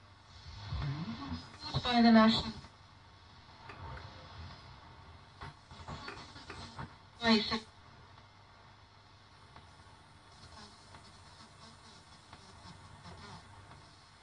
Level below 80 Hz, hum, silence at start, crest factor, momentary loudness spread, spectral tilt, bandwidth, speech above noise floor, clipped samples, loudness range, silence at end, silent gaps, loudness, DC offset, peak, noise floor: -58 dBFS; none; 0.35 s; 24 dB; 27 LU; -5.5 dB/octave; 10 kHz; 33 dB; under 0.1%; 24 LU; 0.5 s; none; -32 LUFS; under 0.1%; -14 dBFS; -59 dBFS